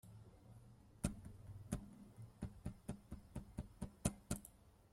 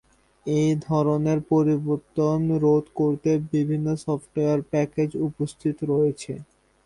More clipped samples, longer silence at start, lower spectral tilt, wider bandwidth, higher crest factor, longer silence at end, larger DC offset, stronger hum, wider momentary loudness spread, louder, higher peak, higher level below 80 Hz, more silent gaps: neither; second, 0.05 s vs 0.45 s; second, -5.5 dB/octave vs -8.5 dB/octave; first, 16.5 kHz vs 11 kHz; first, 30 dB vs 14 dB; second, 0 s vs 0.45 s; neither; neither; first, 18 LU vs 7 LU; second, -50 LUFS vs -24 LUFS; second, -22 dBFS vs -10 dBFS; about the same, -58 dBFS vs -56 dBFS; neither